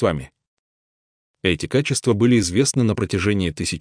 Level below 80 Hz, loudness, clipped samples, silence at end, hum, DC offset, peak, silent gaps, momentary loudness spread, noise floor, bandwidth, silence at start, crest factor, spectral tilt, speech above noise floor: -46 dBFS; -20 LUFS; under 0.1%; 0 s; none; under 0.1%; -4 dBFS; 0.47-1.34 s; 6 LU; under -90 dBFS; 10.5 kHz; 0 s; 16 dB; -5 dB/octave; over 71 dB